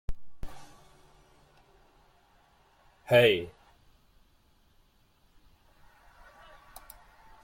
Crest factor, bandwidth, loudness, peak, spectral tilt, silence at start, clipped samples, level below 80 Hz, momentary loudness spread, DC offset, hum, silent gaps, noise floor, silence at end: 26 dB; 16.5 kHz; -24 LUFS; -8 dBFS; -5.5 dB/octave; 0.1 s; under 0.1%; -50 dBFS; 31 LU; under 0.1%; none; none; -65 dBFS; 3.95 s